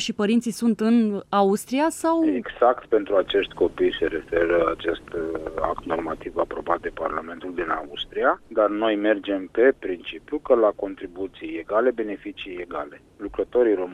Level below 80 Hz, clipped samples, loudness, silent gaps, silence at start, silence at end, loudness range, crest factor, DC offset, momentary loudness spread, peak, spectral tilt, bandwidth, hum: -50 dBFS; under 0.1%; -24 LUFS; none; 0 s; 0 s; 5 LU; 18 dB; under 0.1%; 12 LU; -4 dBFS; -5 dB/octave; 15 kHz; none